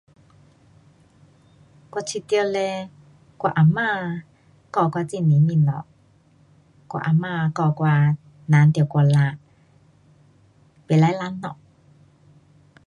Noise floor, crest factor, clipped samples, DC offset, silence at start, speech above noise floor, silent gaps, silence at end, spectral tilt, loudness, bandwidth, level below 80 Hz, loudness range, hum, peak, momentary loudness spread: -56 dBFS; 18 dB; under 0.1%; under 0.1%; 1.95 s; 37 dB; none; 1.35 s; -7.5 dB/octave; -21 LUFS; 10.5 kHz; -62 dBFS; 7 LU; none; -4 dBFS; 15 LU